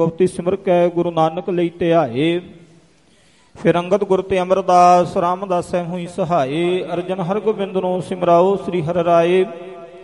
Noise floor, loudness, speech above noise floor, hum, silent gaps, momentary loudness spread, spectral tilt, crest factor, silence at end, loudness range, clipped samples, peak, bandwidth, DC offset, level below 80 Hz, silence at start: -53 dBFS; -17 LUFS; 37 dB; none; none; 9 LU; -7 dB/octave; 16 dB; 0 s; 3 LU; under 0.1%; 0 dBFS; 11.5 kHz; 0.1%; -54 dBFS; 0 s